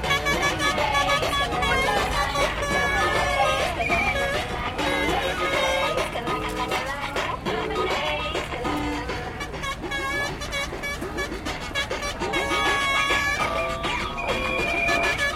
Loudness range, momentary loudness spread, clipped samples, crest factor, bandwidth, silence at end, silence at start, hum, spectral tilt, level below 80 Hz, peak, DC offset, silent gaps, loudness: 6 LU; 7 LU; under 0.1%; 18 dB; 16.5 kHz; 0 s; 0 s; none; -3.5 dB/octave; -38 dBFS; -8 dBFS; under 0.1%; none; -24 LUFS